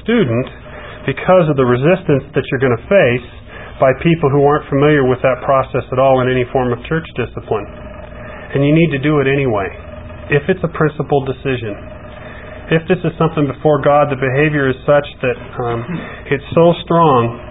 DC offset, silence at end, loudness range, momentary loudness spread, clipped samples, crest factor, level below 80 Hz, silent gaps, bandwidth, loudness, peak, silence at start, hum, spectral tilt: 0.5%; 0 s; 4 LU; 19 LU; under 0.1%; 14 dB; -38 dBFS; none; 4 kHz; -15 LUFS; 0 dBFS; 0 s; none; -12.5 dB/octave